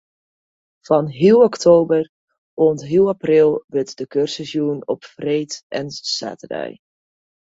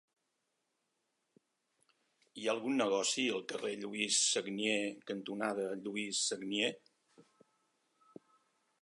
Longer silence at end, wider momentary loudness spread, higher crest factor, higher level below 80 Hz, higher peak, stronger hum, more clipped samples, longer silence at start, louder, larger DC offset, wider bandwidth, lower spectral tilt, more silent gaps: second, 0.85 s vs 1.6 s; first, 15 LU vs 10 LU; about the same, 18 dB vs 20 dB; first, -60 dBFS vs -88 dBFS; first, -2 dBFS vs -18 dBFS; neither; neither; second, 0.9 s vs 2.35 s; first, -18 LUFS vs -35 LUFS; neither; second, 7.8 kHz vs 11.5 kHz; first, -5.5 dB/octave vs -2 dB/octave; first, 2.09-2.28 s, 2.38-2.57 s, 3.64-3.68 s, 5.63-5.70 s vs none